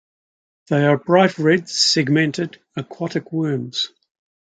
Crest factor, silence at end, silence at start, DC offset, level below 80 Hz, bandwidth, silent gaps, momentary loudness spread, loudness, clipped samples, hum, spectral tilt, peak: 18 dB; 0.6 s; 0.7 s; under 0.1%; -66 dBFS; 9.4 kHz; none; 12 LU; -19 LUFS; under 0.1%; none; -4.5 dB/octave; -2 dBFS